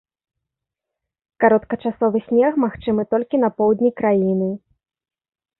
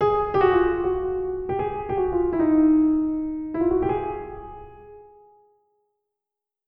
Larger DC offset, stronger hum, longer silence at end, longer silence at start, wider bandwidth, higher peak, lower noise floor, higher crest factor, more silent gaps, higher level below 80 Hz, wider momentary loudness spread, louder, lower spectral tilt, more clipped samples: neither; neither; second, 1.05 s vs 1.65 s; first, 1.4 s vs 0 s; second, 4.1 kHz vs 5.2 kHz; about the same, -4 dBFS vs -6 dBFS; about the same, -83 dBFS vs -86 dBFS; about the same, 16 dB vs 18 dB; neither; second, -56 dBFS vs -44 dBFS; second, 6 LU vs 14 LU; first, -19 LUFS vs -22 LUFS; first, -12.5 dB/octave vs -10 dB/octave; neither